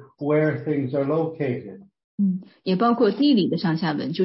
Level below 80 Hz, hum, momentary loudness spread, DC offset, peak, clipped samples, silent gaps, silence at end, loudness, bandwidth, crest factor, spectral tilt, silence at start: -68 dBFS; none; 9 LU; under 0.1%; -8 dBFS; under 0.1%; 2.04-2.18 s; 0 s; -23 LUFS; 5.8 kHz; 14 dB; -11 dB/octave; 0 s